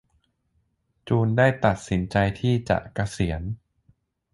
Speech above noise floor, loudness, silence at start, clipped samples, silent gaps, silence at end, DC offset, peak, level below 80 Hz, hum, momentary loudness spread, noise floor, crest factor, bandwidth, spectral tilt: 47 dB; -24 LUFS; 1.05 s; under 0.1%; none; 0.75 s; under 0.1%; -4 dBFS; -42 dBFS; none; 11 LU; -70 dBFS; 20 dB; 11.5 kHz; -7 dB/octave